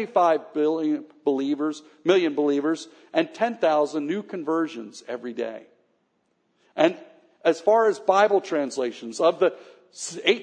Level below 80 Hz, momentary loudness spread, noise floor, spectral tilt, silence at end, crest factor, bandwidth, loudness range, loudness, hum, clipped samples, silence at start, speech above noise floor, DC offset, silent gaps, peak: -86 dBFS; 13 LU; -71 dBFS; -4 dB/octave; 0 s; 20 dB; 10 kHz; 6 LU; -24 LUFS; none; under 0.1%; 0 s; 47 dB; under 0.1%; none; -4 dBFS